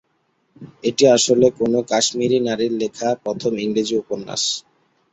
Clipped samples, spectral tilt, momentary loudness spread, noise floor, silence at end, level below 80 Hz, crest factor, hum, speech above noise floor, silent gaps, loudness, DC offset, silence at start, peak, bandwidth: under 0.1%; -3.5 dB/octave; 10 LU; -66 dBFS; 0.5 s; -60 dBFS; 18 dB; none; 48 dB; none; -19 LUFS; under 0.1%; 0.6 s; -2 dBFS; 8.4 kHz